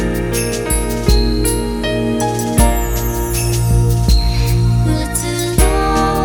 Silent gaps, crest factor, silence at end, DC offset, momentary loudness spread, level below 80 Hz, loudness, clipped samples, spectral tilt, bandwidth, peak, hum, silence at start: none; 14 dB; 0 s; under 0.1%; 4 LU; -18 dBFS; -16 LUFS; under 0.1%; -5 dB/octave; 19 kHz; 0 dBFS; none; 0 s